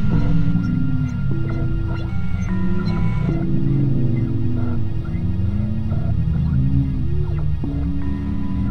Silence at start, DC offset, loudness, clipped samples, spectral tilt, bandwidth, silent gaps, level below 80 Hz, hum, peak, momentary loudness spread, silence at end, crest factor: 0 s; 5%; -22 LUFS; under 0.1%; -9.5 dB/octave; 6.6 kHz; none; -26 dBFS; none; -6 dBFS; 5 LU; 0 s; 12 dB